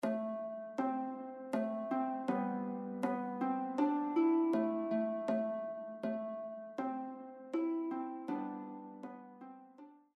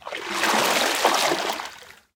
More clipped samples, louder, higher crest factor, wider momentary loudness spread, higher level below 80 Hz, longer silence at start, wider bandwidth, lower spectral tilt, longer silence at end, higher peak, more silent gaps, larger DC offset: neither; second, -38 LUFS vs -21 LUFS; about the same, 16 dB vs 20 dB; first, 16 LU vs 11 LU; second, -86 dBFS vs -66 dBFS; about the same, 0 s vs 0.05 s; second, 11 kHz vs 19 kHz; first, -8 dB/octave vs -1 dB/octave; about the same, 0.2 s vs 0.25 s; second, -22 dBFS vs -4 dBFS; neither; neither